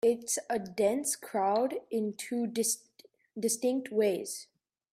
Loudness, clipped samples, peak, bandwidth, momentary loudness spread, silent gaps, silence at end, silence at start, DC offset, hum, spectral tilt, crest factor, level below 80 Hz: -31 LUFS; under 0.1%; -16 dBFS; 16 kHz; 7 LU; none; 0.5 s; 0.05 s; under 0.1%; none; -3.5 dB/octave; 16 dB; -78 dBFS